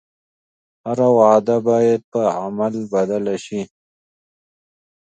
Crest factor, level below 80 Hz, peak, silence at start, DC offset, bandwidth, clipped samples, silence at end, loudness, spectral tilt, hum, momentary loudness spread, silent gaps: 20 dB; -64 dBFS; 0 dBFS; 0.85 s; under 0.1%; 9 kHz; under 0.1%; 1.35 s; -18 LUFS; -7 dB/octave; none; 15 LU; 2.04-2.12 s